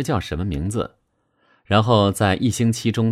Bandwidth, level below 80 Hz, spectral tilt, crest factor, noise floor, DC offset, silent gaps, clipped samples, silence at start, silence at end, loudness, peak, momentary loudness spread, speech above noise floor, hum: 15 kHz; -40 dBFS; -6 dB/octave; 18 dB; -65 dBFS; under 0.1%; none; under 0.1%; 0 s; 0 s; -20 LUFS; -4 dBFS; 9 LU; 46 dB; none